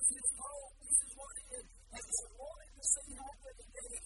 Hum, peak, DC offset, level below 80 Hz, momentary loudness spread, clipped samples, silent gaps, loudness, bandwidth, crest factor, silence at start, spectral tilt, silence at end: none; -14 dBFS; under 0.1%; -58 dBFS; 20 LU; under 0.1%; none; -35 LUFS; 11.5 kHz; 26 dB; 0 s; -0.5 dB/octave; 0 s